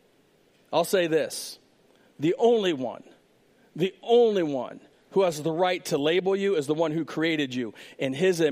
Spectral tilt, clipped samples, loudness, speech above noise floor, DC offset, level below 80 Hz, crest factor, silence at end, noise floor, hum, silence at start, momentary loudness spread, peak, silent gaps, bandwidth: -5 dB/octave; under 0.1%; -26 LUFS; 38 dB; under 0.1%; -76 dBFS; 16 dB; 0 s; -62 dBFS; none; 0.7 s; 12 LU; -10 dBFS; none; 15.5 kHz